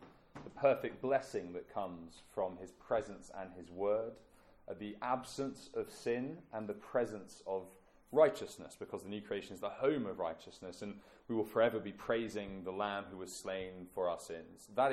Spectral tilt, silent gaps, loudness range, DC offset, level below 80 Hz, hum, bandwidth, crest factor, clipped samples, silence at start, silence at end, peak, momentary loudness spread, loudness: -5 dB/octave; none; 4 LU; under 0.1%; -70 dBFS; none; 15 kHz; 24 dB; under 0.1%; 0 s; 0 s; -16 dBFS; 16 LU; -39 LUFS